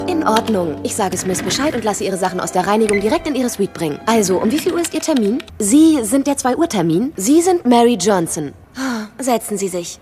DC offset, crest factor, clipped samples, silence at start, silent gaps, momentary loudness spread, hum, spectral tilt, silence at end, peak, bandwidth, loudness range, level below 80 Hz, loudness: under 0.1%; 16 dB; under 0.1%; 0 s; none; 9 LU; none; -4.5 dB/octave; 0.05 s; 0 dBFS; 15.5 kHz; 3 LU; -48 dBFS; -16 LUFS